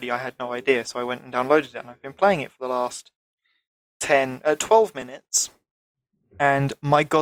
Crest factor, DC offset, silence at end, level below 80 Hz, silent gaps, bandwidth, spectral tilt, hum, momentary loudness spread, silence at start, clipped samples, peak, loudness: 20 dB; under 0.1%; 0 s; -62 dBFS; 3.15-3.38 s, 3.67-4.00 s, 5.71-5.95 s; 16.5 kHz; -3.5 dB/octave; none; 12 LU; 0 s; under 0.1%; -4 dBFS; -23 LUFS